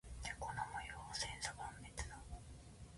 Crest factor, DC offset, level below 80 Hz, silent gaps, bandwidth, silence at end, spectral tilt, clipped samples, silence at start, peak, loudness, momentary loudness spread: 24 dB; under 0.1%; -56 dBFS; none; 11.5 kHz; 0 s; -2.5 dB/octave; under 0.1%; 0.05 s; -26 dBFS; -47 LUFS; 12 LU